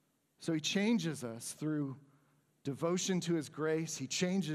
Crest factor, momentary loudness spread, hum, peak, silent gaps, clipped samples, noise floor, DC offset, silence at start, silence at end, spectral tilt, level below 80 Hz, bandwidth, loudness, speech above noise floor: 18 dB; 11 LU; none; -20 dBFS; none; under 0.1%; -72 dBFS; under 0.1%; 0.4 s; 0 s; -4.5 dB/octave; -82 dBFS; 15 kHz; -36 LUFS; 37 dB